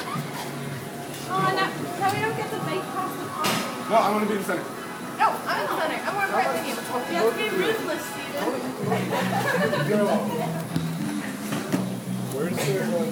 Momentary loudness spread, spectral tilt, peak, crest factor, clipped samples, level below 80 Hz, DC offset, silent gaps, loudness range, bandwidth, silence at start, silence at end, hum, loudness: 8 LU; -5 dB/octave; -8 dBFS; 18 dB; under 0.1%; -64 dBFS; under 0.1%; none; 2 LU; 19.5 kHz; 0 s; 0 s; none; -26 LUFS